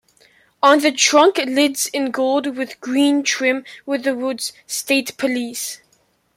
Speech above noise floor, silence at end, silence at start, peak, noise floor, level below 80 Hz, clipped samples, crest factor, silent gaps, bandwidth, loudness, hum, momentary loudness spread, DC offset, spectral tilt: 43 dB; 0.6 s; 0.65 s; -2 dBFS; -61 dBFS; -70 dBFS; under 0.1%; 18 dB; none; 16.5 kHz; -18 LUFS; none; 12 LU; under 0.1%; -1 dB/octave